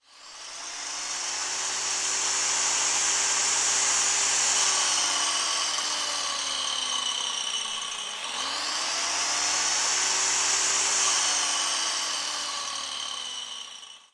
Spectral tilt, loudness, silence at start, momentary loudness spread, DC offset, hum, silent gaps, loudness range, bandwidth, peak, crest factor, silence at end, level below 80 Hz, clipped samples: 2.5 dB/octave; -24 LUFS; 0.15 s; 10 LU; under 0.1%; none; none; 5 LU; 12 kHz; -12 dBFS; 16 dB; 0.15 s; -72 dBFS; under 0.1%